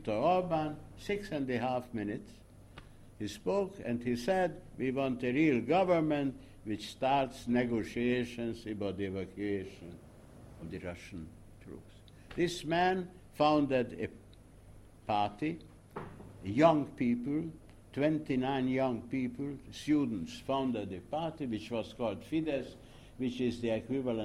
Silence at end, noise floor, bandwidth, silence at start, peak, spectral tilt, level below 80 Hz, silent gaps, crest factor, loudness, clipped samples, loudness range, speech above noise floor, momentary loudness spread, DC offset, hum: 0 s; -56 dBFS; 14 kHz; 0 s; -14 dBFS; -6.5 dB/octave; -58 dBFS; none; 20 dB; -34 LUFS; under 0.1%; 6 LU; 23 dB; 18 LU; under 0.1%; none